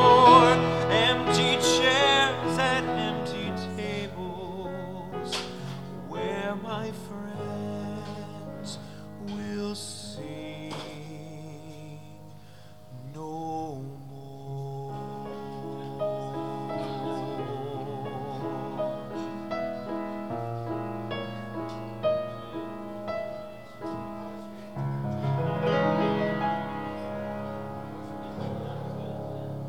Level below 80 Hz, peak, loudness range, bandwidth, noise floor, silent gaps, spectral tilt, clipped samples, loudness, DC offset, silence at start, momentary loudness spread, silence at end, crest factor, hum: -58 dBFS; -2 dBFS; 14 LU; 17.5 kHz; -50 dBFS; none; -4.5 dB/octave; under 0.1%; -29 LUFS; 0.3%; 0 s; 18 LU; 0 s; 26 dB; none